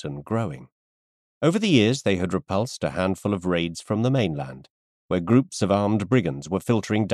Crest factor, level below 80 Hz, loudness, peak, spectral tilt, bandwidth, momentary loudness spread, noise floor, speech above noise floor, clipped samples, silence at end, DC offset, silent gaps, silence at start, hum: 18 dB; -56 dBFS; -24 LUFS; -6 dBFS; -6 dB/octave; 13 kHz; 9 LU; under -90 dBFS; over 67 dB; under 0.1%; 0 s; under 0.1%; 0.72-1.41 s, 4.70-5.09 s; 0.05 s; none